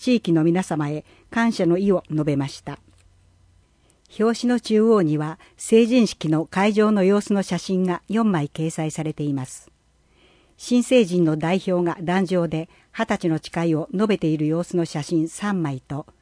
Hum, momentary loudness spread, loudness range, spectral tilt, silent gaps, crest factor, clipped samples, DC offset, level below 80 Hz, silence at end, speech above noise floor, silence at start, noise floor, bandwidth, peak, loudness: none; 11 LU; 5 LU; -6.5 dB/octave; none; 16 dB; under 0.1%; under 0.1%; -58 dBFS; 0.2 s; 39 dB; 0 s; -59 dBFS; 10.5 kHz; -6 dBFS; -21 LUFS